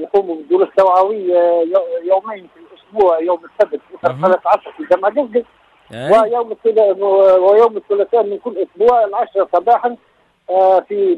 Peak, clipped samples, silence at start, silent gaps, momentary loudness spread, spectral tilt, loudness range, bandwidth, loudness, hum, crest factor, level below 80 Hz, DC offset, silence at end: -2 dBFS; under 0.1%; 0 s; none; 9 LU; -7 dB/octave; 3 LU; 8 kHz; -14 LUFS; none; 12 dB; -60 dBFS; under 0.1%; 0 s